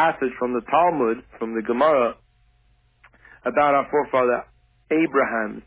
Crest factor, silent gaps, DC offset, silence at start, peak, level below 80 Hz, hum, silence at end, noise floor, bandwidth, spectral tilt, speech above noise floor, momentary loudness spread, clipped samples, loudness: 16 dB; none; under 0.1%; 0 s; -6 dBFS; -58 dBFS; none; 0.05 s; -61 dBFS; 4 kHz; -9.5 dB/octave; 40 dB; 9 LU; under 0.1%; -22 LUFS